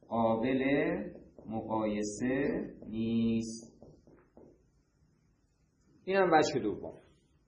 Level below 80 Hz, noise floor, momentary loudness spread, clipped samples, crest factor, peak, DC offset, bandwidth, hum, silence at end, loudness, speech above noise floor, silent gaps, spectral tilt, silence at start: -62 dBFS; -71 dBFS; 17 LU; under 0.1%; 22 dB; -12 dBFS; under 0.1%; 9.6 kHz; none; 0.5 s; -32 LUFS; 40 dB; none; -5.5 dB/octave; 0.1 s